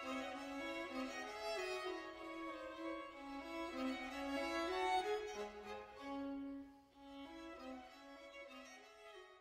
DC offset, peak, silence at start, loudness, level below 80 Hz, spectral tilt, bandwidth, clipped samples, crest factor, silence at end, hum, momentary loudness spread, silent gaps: under 0.1%; -28 dBFS; 0 s; -46 LUFS; -72 dBFS; -3 dB/octave; 16 kHz; under 0.1%; 20 dB; 0 s; none; 17 LU; none